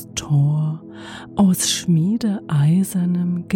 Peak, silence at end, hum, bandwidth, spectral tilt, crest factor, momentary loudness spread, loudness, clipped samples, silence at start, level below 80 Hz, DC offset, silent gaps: -6 dBFS; 0 s; none; 17 kHz; -5.5 dB/octave; 12 dB; 11 LU; -19 LUFS; under 0.1%; 0 s; -52 dBFS; under 0.1%; none